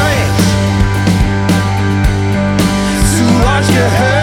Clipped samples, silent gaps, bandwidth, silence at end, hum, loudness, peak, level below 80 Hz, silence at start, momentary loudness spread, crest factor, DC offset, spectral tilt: under 0.1%; none; 16.5 kHz; 0 s; none; -11 LUFS; 0 dBFS; -20 dBFS; 0 s; 3 LU; 10 dB; under 0.1%; -5.5 dB/octave